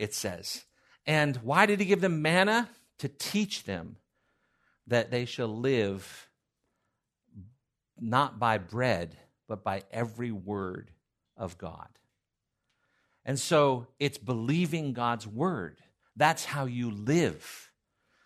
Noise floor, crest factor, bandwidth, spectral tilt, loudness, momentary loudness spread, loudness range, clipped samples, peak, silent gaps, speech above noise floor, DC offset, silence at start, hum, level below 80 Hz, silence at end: -84 dBFS; 26 dB; 13.5 kHz; -5 dB/octave; -29 LUFS; 17 LU; 10 LU; under 0.1%; -6 dBFS; none; 55 dB; under 0.1%; 0 s; none; -70 dBFS; 0.6 s